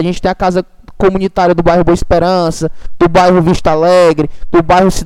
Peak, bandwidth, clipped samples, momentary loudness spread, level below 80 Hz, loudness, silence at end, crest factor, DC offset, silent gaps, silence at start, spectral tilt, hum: 0 dBFS; 14 kHz; 0.2%; 8 LU; -26 dBFS; -11 LUFS; 0 s; 10 dB; under 0.1%; none; 0 s; -6.5 dB/octave; none